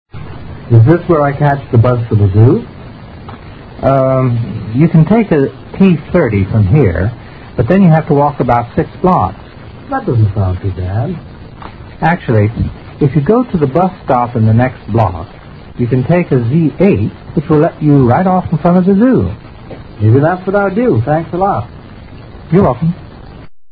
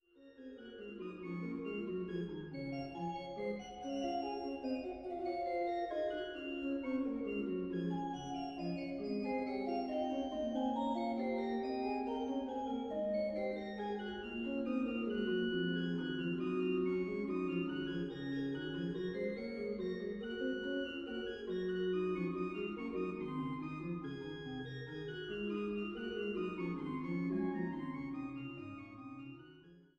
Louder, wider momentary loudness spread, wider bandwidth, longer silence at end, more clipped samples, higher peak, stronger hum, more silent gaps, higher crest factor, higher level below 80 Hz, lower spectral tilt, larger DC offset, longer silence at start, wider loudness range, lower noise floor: first, -12 LUFS vs -40 LUFS; first, 21 LU vs 8 LU; second, 4.9 kHz vs 7.6 kHz; second, 0 s vs 0.15 s; first, 0.3% vs under 0.1%; first, 0 dBFS vs -26 dBFS; neither; neither; about the same, 12 dB vs 14 dB; first, -32 dBFS vs -66 dBFS; first, -11.5 dB/octave vs -7.5 dB/octave; neither; about the same, 0.15 s vs 0.15 s; about the same, 4 LU vs 4 LU; second, -31 dBFS vs -60 dBFS